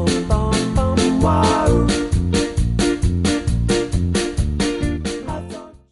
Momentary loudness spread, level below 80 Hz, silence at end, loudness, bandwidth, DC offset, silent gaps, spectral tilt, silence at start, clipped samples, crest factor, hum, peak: 10 LU; -24 dBFS; 0.15 s; -19 LUFS; 11.5 kHz; under 0.1%; none; -5.5 dB/octave; 0 s; under 0.1%; 14 dB; none; -4 dBFS